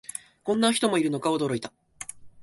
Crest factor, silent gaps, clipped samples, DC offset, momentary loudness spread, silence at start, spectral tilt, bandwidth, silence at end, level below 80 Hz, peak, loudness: 18 dB; none; under 0.1%; under 0.1%; 17 LU; 0.15 s; -4 dB/octave; 12 kHz; 0 s; -66 dBFS; -10 dBFS; -25 LUFS